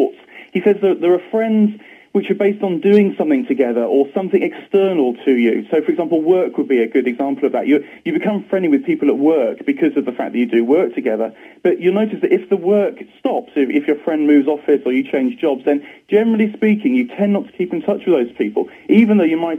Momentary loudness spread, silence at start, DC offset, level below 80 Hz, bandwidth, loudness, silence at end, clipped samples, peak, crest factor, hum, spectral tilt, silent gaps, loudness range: 7 LU; 0 s; under 0.1%; -68 dBFS; 4 kHz; -16 LUFS; 0 s; under 0.1%; 0 dBFS; 16 dB; none; -8.5 dB/octave; none; 1 LU